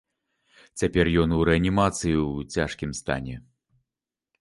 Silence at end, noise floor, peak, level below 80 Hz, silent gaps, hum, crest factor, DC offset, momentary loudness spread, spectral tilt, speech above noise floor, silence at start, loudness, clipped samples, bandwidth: 1 s; -90 dBFS; -6 dBFS; -40 dBFS; none; none; 20 dB; under 0.1%; 11 LU; -5.5 dB/octave; 66 dB; 0.75 s; -24 LUFS; under 0.1%; 11.5 kHz